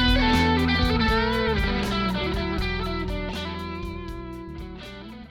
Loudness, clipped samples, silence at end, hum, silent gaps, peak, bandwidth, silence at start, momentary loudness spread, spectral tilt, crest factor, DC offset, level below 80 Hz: -24 LUFS; under 0.1%; 0 s; none; none; -10 dBFS; 17 kHz; 0 s; 17 LU; -6 dB/octave; 16 dB; under 0.1%; -32 dBFS